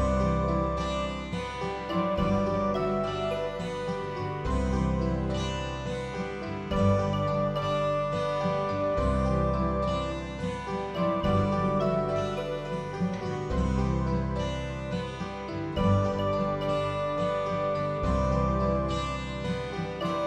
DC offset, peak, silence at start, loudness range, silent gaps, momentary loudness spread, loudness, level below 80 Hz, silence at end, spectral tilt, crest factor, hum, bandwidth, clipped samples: under 0.1%; -14 dBFS; 0 s; 3 LU; none; 7 LU; -29 LUFS; -38 dBFS; 0 s; -7 dB/octave; 14 dB; none; 10.5 kHz; under 0.1%